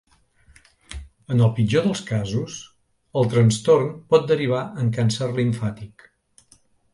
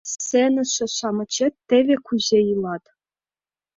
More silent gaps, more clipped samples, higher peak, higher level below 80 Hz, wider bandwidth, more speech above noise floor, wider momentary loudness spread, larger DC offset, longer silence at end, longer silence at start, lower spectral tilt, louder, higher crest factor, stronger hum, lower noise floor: neither; neither; about the same, -4 dBFS vs -6 dBFS; first, -50 dBFS vs -64 dBFS; first, 11.5 kHz vs 7.8 kHz; second, 38 dB vs over 70 dB; first, 21 LU vs 7 LU; neither; about the same, 1.05 s vs 1 s; first, 0.9 s vs 0.05 s; first, -6.5 dB/octave vs -3.5 dB/octave; about the same, -21 LUFS vs -21 LUFS; about the same, 18 dB vs 16 dB; neither; second, -58 dBFS vs under -90 dBFS